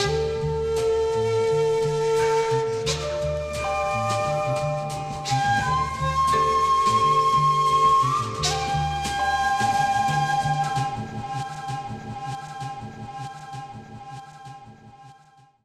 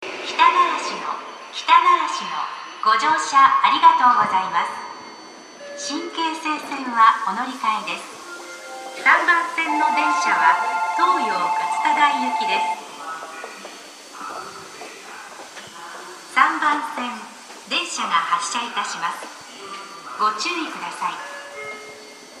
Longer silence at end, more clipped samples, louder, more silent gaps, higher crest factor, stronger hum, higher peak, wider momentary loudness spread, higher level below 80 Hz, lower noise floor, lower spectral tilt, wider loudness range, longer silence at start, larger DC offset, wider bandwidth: first, 0.55 s vs 0 s; neither; second, -23 LUFS vs -19 LUFS; neither; second, 14 dB vs 20 dB; neither; second, -10 dBFS vs 0 dBFS; second, 17 LU vs 21 LU; first, -44 dBFS vs -76 dBFS; first, -55 dBFS vs -41 dBFS; first, -4.5 dB/octave vs -1 dB/octave; first, 14 LU vs 9 LU; about the same, 0 s vs 0 s; neither; about the same, 14.5 kHz vs 14 kHz